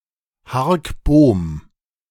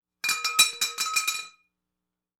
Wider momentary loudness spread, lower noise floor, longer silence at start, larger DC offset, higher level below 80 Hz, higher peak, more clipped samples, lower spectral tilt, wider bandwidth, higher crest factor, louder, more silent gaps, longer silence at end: about the same, 14 LU vs 12 LU; second, -50 dBFS vs -86 dBFS; first, 0.5 s vs 0.25 s; neither; first, -30 dBFS vs -74 dBFS; first, -2 dBFS vs -6 dBFS; neither; first, -8 dB/octave vs 3 dB/octave; second, 14.5 kHz vs over 20 kHz; second, 16 dB vs 24 dB; first, -17 LUFS vs -24 LUFS; neither; second, 0.5 s vs 0.9 s